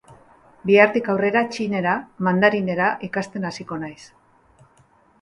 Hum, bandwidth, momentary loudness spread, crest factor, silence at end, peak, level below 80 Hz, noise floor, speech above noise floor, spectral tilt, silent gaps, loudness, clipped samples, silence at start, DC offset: none; 11 kHz; 15 LU; 22 dB; 1.15 s; 0 dBFS; -60 dBFS; -57 dBFS; 36 dB; -6.5 dB/octave; none; -20 LUFS; under 0.1%; 0.1 s; under 0.1%